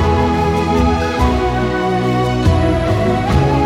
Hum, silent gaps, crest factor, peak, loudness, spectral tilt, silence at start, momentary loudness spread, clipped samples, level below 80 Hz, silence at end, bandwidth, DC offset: none; none; 12 dB; -2 dBFS; -15 LUFS; -7 dB/octave; 0 s; 2 LU; under 0.1%; -22 dBFS; 0 s; 14 kHz; under 0.1%